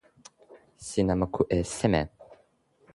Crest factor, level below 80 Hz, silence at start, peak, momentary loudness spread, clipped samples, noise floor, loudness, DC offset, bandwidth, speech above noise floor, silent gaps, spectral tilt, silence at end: 22 dB; -46 dBFS; 0.5 s; -8 dBFS; 10 LU; under 0.1%; -65 dBFS; -28 LUFS; under 0.1%; 11.5 kHz; 38 dB; none; -6 dB/octave; 0.6 s